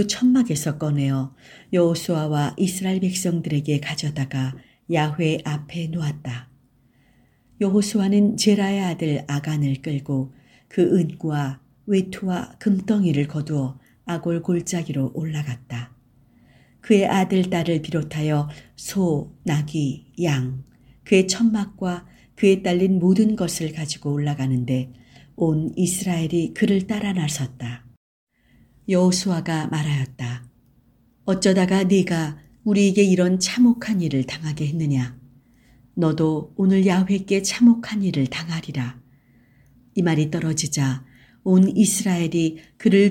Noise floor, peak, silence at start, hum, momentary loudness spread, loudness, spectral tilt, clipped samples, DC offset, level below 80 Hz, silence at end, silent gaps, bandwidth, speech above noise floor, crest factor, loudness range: -59 dBFS; -2 dBFS; 0 s; none; 12 LU; -22 LUFS; -6 dB/octave; under 0.1%; under 0.1%; -56 dBFS; 0 s; 27.97-28.27 s; 16.5 kHz; 38 dB; 18 dB; 5 LU